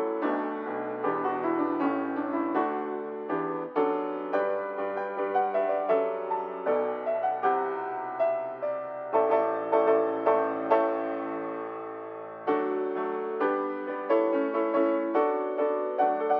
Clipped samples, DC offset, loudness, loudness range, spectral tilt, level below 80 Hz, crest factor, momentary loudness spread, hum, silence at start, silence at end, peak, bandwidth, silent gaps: under 0.1%; under 0.1%; -28 LUFS; 3 LU; -4.5 dB/octave; -84 dBFS; 18 dB; 8 LU; none; 0 s; 0 s; -10 dBFS; 5.2 kHz; none